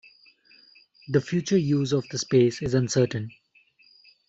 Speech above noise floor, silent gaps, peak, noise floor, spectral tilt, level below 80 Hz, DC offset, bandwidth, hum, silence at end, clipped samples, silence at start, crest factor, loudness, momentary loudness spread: 37 dB; none; -8 dBFS; -61 dBFS; -6 dB/octave; -58 dBFS; under 0.1%; 8 kHz; none; 1 s; under 0.1%; 1.1 s; 18 dB; -24 LUFS; 5 LU